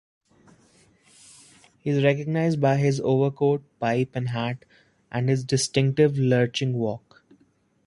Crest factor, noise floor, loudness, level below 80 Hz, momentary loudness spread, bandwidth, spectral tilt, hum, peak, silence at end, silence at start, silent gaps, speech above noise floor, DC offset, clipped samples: 20 dB; -64 dBFS; -24 LUFS; -62 dBFS; 9 LU; 11.5 kHz; -6 dB/octave; none; -4 dBFS; 0.9 s; 1.85 s; none; 41 dB; under 0.1%; under 0.1%